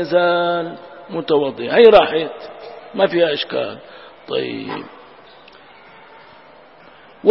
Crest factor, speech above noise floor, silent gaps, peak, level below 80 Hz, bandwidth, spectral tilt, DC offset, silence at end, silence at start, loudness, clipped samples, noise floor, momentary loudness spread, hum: 18 dB; 28 dB; none; 0 dBFS; -54 dBFS; 5.8 kHz; -7.5 dB/octave; 0.1%; 0 s; 0 s; -17 LUFS; under 0.1%; -45 dBFS; 25 LU; none